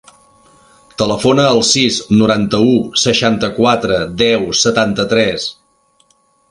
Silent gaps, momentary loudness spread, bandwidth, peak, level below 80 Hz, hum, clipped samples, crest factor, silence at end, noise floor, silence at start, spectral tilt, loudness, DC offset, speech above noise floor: none; 6 LU; 11.5 kHz; 0 dBFS; -44 dBFS; none; under 0.1%; 14 dB; 1 s; -56 dBFS; 1 s; -4 dB/octave; -13 LUFS; under 0.1%; 43 dB